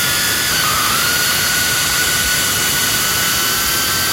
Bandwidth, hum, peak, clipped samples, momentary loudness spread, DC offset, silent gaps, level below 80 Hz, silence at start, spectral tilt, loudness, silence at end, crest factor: 16.5 kHz; none; -4 dBFS; under 0.1%; 1 LU; under 0.1%; none; -38 dBFS; 0 s; -0.5 dB/octave; -13 LUFS; 0 s; 12 dB